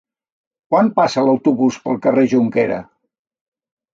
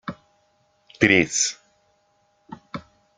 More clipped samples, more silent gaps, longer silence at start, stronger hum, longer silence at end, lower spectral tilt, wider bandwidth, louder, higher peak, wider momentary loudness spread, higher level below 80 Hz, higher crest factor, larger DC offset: neither; neither; first, 0.7 s vs 0.05 s; neither; first, 1.1 s vs 0.35 s; first, -6.5 dB/octave vs -3 dB/octave; second, 7.6 kHz vs 10.5 kHz; first, -16 LUFS vs -19 LUFS; about the same, -2 dBFS vs -2 dBFS; second, 5 LU vs 22 LU; about the same, -62 dBFS vs -60 dBFS; second, 16 dB vs 24 dB; neither